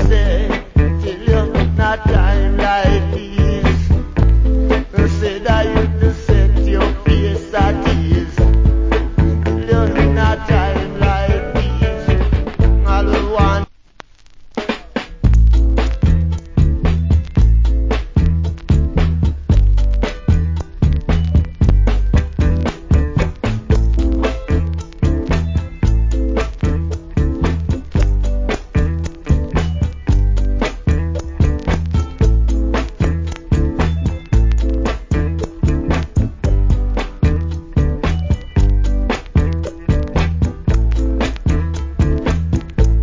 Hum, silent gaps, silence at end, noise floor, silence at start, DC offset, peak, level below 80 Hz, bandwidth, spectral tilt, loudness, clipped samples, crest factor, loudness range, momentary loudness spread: none; none; 0 s; -41 dBFS; 0 s; under 0.1%; 0 dBFS; -16 dBFS; 7.6 kHz; -7.5 dB/octave; -17 LUFS; under 0.1%; 14 dB; 3 LU; 5 LU